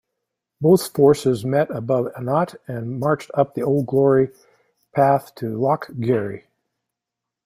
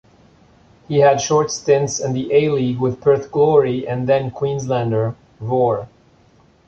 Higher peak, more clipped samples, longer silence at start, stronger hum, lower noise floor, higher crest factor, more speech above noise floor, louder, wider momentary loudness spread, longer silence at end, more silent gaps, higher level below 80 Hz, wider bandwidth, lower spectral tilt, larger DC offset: about the same, -2 dBFS vs -2 dBFS; neither; second, 0.6 s vs 0.9 s; neither; first, -85 dBFS vs -53 dBFS; about the same, 18 dB vs 16 dB; first, 66 dB vs 36 dB; about the same, -20 LUFS vs -18 LUFS; first, 11 LU vs 8 LU; first, 1.05 s vs 0.8 s; neither; second, -60 dBFS vs -52 dBFS; first, 16 kHz vs 7.8 kHz; first, -7 dB/octave vs -5.5 dB/octave; neither